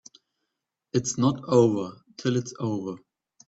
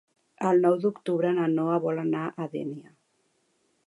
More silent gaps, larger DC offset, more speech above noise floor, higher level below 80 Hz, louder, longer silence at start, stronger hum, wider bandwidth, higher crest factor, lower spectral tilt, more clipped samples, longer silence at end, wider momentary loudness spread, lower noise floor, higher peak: neither; neither; first, 59 dB vs 46 dB; first, -64 dBFS vs -78 dBFS; about the same, -26 LUFS vs -26 LUFS; first, 0.95 s vs 0.4 s; neither; second, 8.4 kHz vs 11 kHz; about the same, 20 dB vs 18 dB; second, -6 dB/octave vs -8.5 dB/octave; neither; second, 0.5 s vs 1.05 s; first, 15 LU vs 12 LU; first, -83 dBFS vs -71 dBFS; first, -6 dBFS vs -10 dBFS